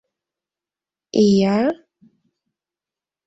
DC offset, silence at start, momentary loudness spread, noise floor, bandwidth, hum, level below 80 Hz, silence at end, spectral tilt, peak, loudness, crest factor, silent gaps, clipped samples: under 0.1%; 1.15 s; 10 LU; -90 dBFS; 8 kHz; none; -60 dBFS; 1.5 s; -6.5 dB/octave; -4 dBFS; -18 LUFS; 18 dB; none; under 0.1%